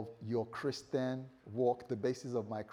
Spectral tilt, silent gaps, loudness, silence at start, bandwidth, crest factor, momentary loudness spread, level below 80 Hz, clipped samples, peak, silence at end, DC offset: -6.5 dB/octave; none; -38 LUFS; 0 s; 11.5 kHz; 18 dB; 5 LU; -78 dBFS; under 0.1%; -20 dBFS; 0 s; under 0.1%